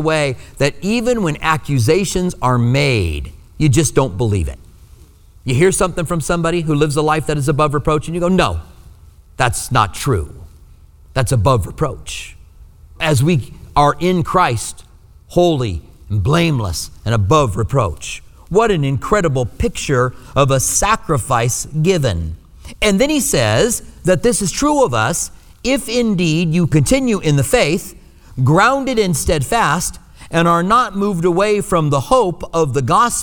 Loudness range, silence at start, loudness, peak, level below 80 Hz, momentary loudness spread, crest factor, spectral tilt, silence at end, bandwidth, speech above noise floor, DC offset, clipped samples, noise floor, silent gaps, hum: 3 LU; 0 s; -16 LUFS; 0 dBFS; -32 dBFS; 9 LU; 16 dB; -5 dB/octave; 0 s; over 20 kHz; 28 dB; under 0.1%; under 0.1%; -43 dBFS; none; none